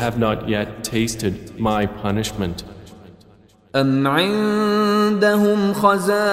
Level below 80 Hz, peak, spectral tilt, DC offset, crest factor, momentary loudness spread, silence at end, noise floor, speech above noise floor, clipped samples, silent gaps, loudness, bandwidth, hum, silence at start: -44 dBFS; -2 dBFS; -5.5 dB/octave; under 0.1%; 18 dB; 9 LU; 0 s; -51 dBFS; 32 dB; under 0.1%; none; -19 LUFS; 16 kHz; none; 0 s